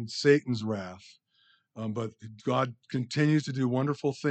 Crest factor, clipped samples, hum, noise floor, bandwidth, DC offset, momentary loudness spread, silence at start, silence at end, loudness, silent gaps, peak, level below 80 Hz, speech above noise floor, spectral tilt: 20 dB; under 0.1%; none; -67 dBFS; 8.8 kHz; under 0.1%; 14 LU; 0 s; 0 s; -29 LUFS; none; -10 dBFS; -76 dBFS; 39 dB; -6.5 dB/octave